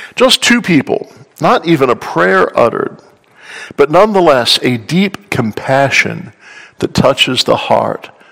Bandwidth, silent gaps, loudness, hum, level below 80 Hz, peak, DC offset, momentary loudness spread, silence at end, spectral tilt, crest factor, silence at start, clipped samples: over 20 kHz; none; -11 LUFS; none; -46 dBFS; 0 dBFS; under 0.1%; 12 LU; 0.25 s; -4.5 dB/octave; 12 dB; 0 s; 1%